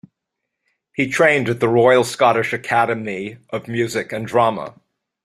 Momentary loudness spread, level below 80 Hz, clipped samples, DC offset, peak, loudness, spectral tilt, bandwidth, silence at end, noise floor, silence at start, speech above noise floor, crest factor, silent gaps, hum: 14 LU; -60 dBFS; under 0.1%; under 0.1%; -2 dBFS; -18 LUFS; -5 dB/octave; 14.5 kHz; 0.55 s; -79 dBFS; 1 s; 62 dB; 18 dB; none; none